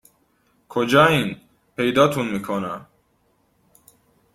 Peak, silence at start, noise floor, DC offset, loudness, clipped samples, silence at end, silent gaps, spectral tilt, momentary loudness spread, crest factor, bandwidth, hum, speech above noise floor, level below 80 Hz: -2 dBFS; 0.7 s; -64 dBFS; under 0.1%; -20 LUFS; under 0.1%; 1.5 s; none; -5.5 dB/octave; 19 LU; 20 dB; 16 kHz; none; 45 dB; -56 dBFS